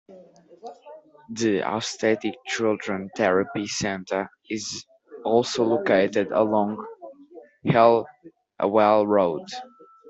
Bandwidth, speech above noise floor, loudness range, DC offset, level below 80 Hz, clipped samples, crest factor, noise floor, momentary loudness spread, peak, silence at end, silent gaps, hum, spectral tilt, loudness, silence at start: 8.2 kHz; 27 dB; 4 LU; under 0.1%; -64 dBFS; under 0.1%; 20 dB; -50 dBFS; 19 LU; -4 dBFS; 0 s; none; none; -5 dB/octave; -23 LUFS; 0.1 s